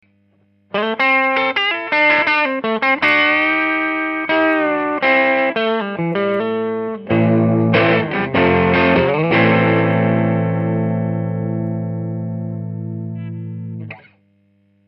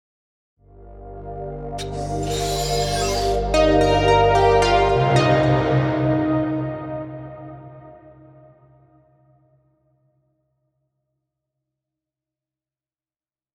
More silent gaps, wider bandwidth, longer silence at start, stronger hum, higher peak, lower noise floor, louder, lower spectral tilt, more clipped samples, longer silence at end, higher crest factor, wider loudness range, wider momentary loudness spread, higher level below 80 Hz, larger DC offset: neither; second, 6 kHz vs 17 kHz; about the same, 0.75 s vs 0.8 s; neither; first, 0 dBFS vs -4 dBFS; second, -58 dBFS vs under -90 dBFS; first, -16 LUFS vs -19 LUFS; first, -8.5 dB/octave vs -5.5 dB/octave; neither; second, 0.9 s vs 5.45 s; about the same, 16 dB vs 20 dB; second, 8 LU vs 13 LU; second, 13 LU vs 20 LU; second, -52 dBFS vs -36 dBFS; neither